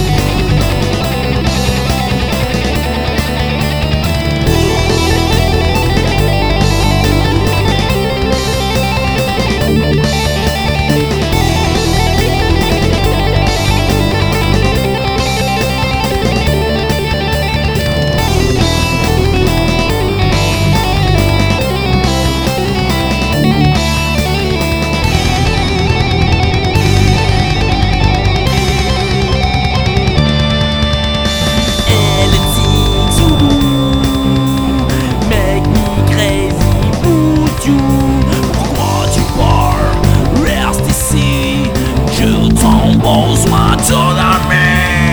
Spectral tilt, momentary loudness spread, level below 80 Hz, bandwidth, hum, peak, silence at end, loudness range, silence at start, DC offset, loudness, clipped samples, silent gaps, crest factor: -5 dB/octave; 4 LU; -18 dBFS; over 20 kHz; none; 0 dBFS; 0 s; 2 LU; 0 s; 0.2%; -12 LUFS; under 0.1%; none; 10 dB